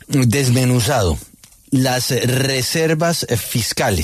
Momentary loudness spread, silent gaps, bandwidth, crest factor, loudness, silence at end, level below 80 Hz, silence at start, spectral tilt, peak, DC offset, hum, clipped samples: 4 LU; none; 14 kHz; 12 dB; -17 LUFS; 0 s; -38 dBFS; 0.1 s; -4.5 dB/octave; -4 dBFS; under 0.1%; none; under 0.1%